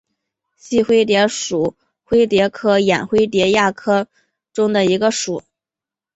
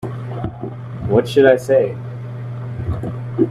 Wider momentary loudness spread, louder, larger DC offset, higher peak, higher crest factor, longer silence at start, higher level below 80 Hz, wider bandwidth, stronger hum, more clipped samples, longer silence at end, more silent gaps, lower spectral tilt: second, 8 LU vs 16 LU; about the same, -16 LUFS vs -18 LUFS; neither; about the same, 0 dBFS vs 0 dBFS; about the same, 16 dB vs 18 dB; first, 0.65 s vs 0 s; second, -52 dBFS vs -42 dBFS; second, 8.2 kHz vs 13.5 kHz; neither; neither; first, 0.75 s vs 0 s; neither; second, -4.5 dB/octave vs -7.5 dB/octave